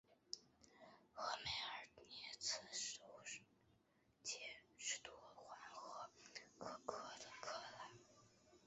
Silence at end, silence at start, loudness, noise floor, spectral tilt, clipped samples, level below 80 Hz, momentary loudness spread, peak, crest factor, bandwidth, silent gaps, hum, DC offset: 0 s; 0.1 s; -51 LUFS; -79 dBFS; 0.5 dB/octave; under 0.1%; -82 dBFS; 14 LU; -28 dBFS; 26 dB; 8 kHz; none; none; under 0.1%